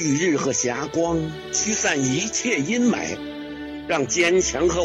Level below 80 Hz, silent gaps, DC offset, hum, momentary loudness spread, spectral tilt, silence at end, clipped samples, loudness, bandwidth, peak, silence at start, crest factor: -46 dBFS; none; under 0.1%; none; 12 LU; -3.5 dB/octave; 0 s; under 0.1%; -21 LUFS; 12 kHz; -8 dBFS; 0 s; 14 dB